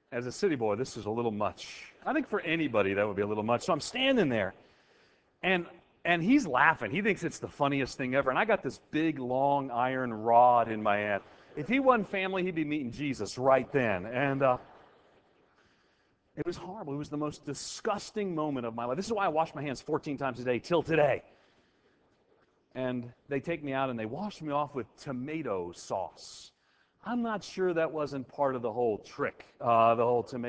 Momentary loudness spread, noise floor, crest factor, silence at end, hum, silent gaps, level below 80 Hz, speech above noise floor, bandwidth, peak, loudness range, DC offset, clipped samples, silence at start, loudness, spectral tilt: 12 LU; -70 dBFS; 24 dB; 0 s; none; none; -64 dBFS; 40 dB; 8 kHz; -8 dBFS; 9 LU; under 0.1%; under 0.1%; 0.1 s; -30 LUFS; -5.5 dB/octave